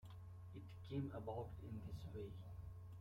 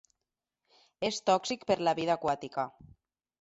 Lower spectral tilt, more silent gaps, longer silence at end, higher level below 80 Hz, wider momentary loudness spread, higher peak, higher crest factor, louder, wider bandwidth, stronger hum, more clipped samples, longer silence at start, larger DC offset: first, -8.5 dB/octave vs -4 dB/octave; neither; second, 0 s vs 0.7 s; about the same, -64 dBFS vs -68 dBFS; about the same, 9 LU vs 8 LU; second, -34 dBFS vs -12 dBFS; about the same, 18 dB vs 22 dB; second, -52 LUFS vs -31 LUFS; first, 16 kHz vs 8.2 kHz; neither; neither; second, 0 s vs 1 s; neither